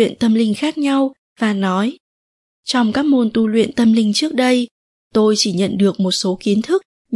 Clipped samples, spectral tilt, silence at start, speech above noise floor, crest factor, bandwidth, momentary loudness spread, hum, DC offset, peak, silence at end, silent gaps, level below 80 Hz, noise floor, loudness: under 0.1%; -5 dB/octave; 0 s; over 75 dB; 14 dB; 11.5 kHz; 6 LU; none; under 0.1%; -2 dBFS; 0 s; 1.18-1.36 s, 2.00-2.63 s, 4.71-5.11 s, 6.85-7.05 s; -58 dBFS; under -90 dBFS; -16 LUFS